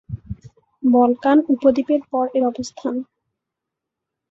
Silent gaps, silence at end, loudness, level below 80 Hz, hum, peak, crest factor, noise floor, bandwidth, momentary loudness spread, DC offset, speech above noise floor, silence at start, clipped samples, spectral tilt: none; 1.25 s; -19 LUFS; -50 dBFS; none; -2 dBFS; 18 dB; -83 dBFS; 7.8 kHz; 18 LU; under 0.1%; 65 dB; 0.1 s; under 0.1%; -7 dB/octave